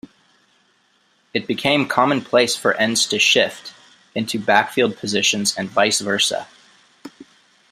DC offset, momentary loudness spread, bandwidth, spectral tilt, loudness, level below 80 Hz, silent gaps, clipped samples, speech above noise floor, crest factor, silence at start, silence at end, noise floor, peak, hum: under 0.1%; 12 LU; 16 kHz; -2.5 dB/octave; -18 LUFS; -64 dBFS; none; under 0.1%; 42 dB; 20 dB; 1.35 s; 0.5 s; -61 dBFS; 0 dBFS; none